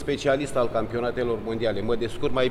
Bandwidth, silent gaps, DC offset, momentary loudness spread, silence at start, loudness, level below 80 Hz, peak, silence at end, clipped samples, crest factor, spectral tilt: 13.5 kHz; none; under 0.1%; 3 LU; 0 s; -26 LUFS; -44 dBFS; -10 dBFS; 0 s; under 0.1%; 14 dB; -5.5 dB/octave